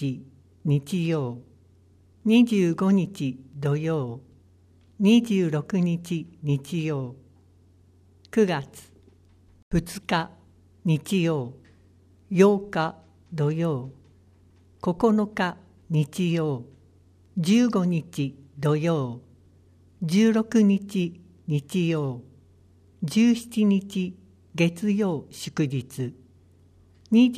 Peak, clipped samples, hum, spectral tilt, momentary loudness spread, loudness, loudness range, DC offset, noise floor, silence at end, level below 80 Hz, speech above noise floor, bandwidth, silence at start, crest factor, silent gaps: -6 dBFS; under 0.1%; none; -7 dB/octave; 14 LU; -25 LUFS; 4 LU; under 0.1%; -57 dBFS; 0 s; -56 dBFS; 33 dB; 14.5 kHz; 0 s; 20 dB; 9.62-9.71 s